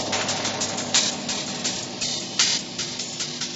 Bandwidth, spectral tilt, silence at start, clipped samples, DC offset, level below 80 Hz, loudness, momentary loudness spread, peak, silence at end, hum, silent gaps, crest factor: 8.2 kHz; -1 dB/octave; 0 s; under 0.1%; under 0.1%; -60 dBFS; -23 LUFS; 7 LU; -4 dBFS; 0 s; none; none; 22 dB